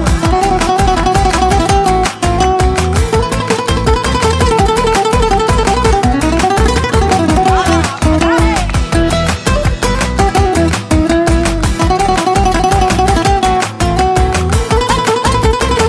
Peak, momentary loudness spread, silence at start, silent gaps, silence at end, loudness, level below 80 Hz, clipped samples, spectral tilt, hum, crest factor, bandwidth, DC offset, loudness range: 0 dBFS; 3 LU; 0 s; none; 0 s; -12 LUFS; -18 dBFS; under 0.1%; -5 dB/octave; none; 10 dB; 11 kHz; under 0.1%; 1 LU